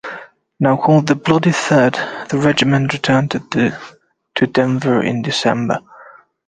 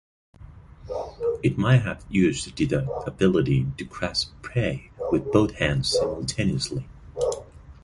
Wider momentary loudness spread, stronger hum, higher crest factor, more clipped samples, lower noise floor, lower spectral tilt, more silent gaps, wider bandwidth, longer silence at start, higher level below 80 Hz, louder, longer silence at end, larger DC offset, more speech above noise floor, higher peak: about the same, 9 LU vs 10 LU; neither; about the same, 16 dB vs 20 dB; neither; about the same, -43 dBFS vs -45 dBFS; about the same, -6 dB/octave vs -6 dB/octave; neither; second, 9.8 kHz vs 11.5 kHz; second, 0.05 s vs 0.4 s; second, -52 dBFS vs -44 dBFS; first, -16 LUFS vs -25 LUFS; first, 0.45 s vs 0.1 s; neither; first, 28 dB vs 22 dB; first, 0 dBFS vs -4 dBFS